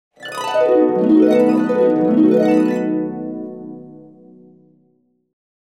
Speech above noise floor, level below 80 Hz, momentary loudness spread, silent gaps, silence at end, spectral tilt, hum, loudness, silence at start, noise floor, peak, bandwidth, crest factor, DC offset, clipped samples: 48 dB; -66 dBFS; 17 LU; none; 1.75 s; -7 dB/octave; none; -15 LUFS; 0.2 s; -61 dBFS; -2 dBFS; 11 kHz; 14 dB; under 0.1%; under 0.1%